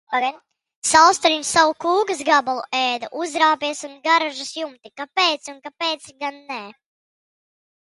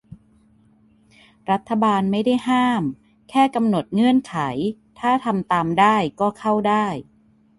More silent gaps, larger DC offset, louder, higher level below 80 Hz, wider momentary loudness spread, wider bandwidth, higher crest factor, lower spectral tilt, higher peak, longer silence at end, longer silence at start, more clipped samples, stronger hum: first, 0.75-0.82 s vs none; neither; about the same, -19 LUFS vs -20 LUFS; second, -64 dBFS vs -58 dBFS; first, 16 LU vs 9 LU; about the same, 11.5 kHz vs 11.5 kHz; about the same, 22 dB vs 18 dB; second, -0.5 dB/octave vs -6.5 dB/octave; first, 0 dBFS vs -4 dBFS; first, 1.2 s vs 0.55 s; about the same, 0.1 s vs 0.1 s; neither; neither